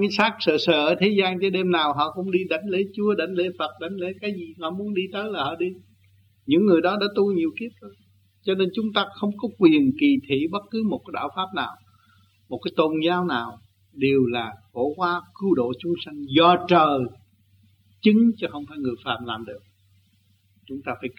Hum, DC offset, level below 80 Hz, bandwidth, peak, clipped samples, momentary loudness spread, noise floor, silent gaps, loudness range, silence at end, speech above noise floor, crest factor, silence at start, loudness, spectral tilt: none; under 0.1%; -66 dBFS; 6.6 kHz; -4 dBFS; under 0.1%; 13 LU; -62 dBFS; none; 5 LU; 0.05 s; 40 dB; 20 dB; 0 s; -23 LUFS; -7 dB/octave